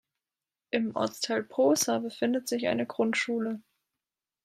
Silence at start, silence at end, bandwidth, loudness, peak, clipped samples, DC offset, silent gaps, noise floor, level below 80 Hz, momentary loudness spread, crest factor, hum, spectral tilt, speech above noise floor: 0.75 s; 0.85 s; 15.5 kHz; -29 LUFS; -12 dBFS; under 0.1%; under 0.1%; none; under -90 dBFS; -78 dBFS; 7 LU; 18 dB; none; -3.5 dB/octave; over 62 dB